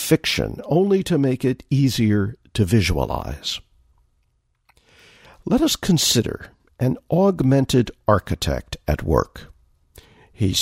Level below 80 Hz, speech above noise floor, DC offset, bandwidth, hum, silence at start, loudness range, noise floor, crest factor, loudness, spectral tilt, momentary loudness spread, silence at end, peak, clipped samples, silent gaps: -36 dBFS; 47 dB; under 0.1%; 16 kHz; none; 0 s; 5 LU; -67 dBFS; 18 dB; -20 LUFS; -5 dB/octave; 9 LU; 0 s; -2 dBFS; under 0.1%; none